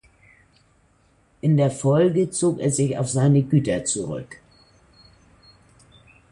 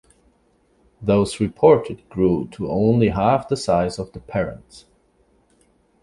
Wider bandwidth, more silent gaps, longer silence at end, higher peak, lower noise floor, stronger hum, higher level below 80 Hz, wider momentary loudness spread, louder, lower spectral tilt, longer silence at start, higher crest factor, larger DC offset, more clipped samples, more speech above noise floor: about the same, 11.5 kHz vs 11.5 kHz; neither; first, 1.95 s vs 1.25 s; second, -6 dBFS vs -2 dBFS; about the same, -60 dBFS vs -61 dBFS; neither; second, -54 dBFS vs -44 dBFS; second, 8 LU vs 13 LU; about the same, -21 LUFS vs -20 LUFS; about the same, -6.5 dB/octave vs -7 dB/octave; first, 1.45 s vs 1 s; about the same, 16 dB vs 20 dB; neither; neither; about the same, 40 dB vs 42 dB